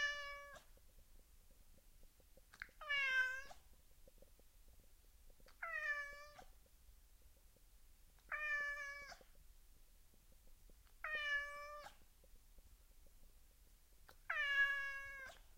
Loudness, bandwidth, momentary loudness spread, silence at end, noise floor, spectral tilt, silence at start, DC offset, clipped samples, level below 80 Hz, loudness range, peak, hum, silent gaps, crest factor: -42 LUFS; 16 kHz; 24 LU; 0 s; -67 dBFS; -0.5 dB/octave; 0 s; under 0.1%; under 0.1%; -66 dBFS; 7 LU; -26 dBFS; none; none; 22 dB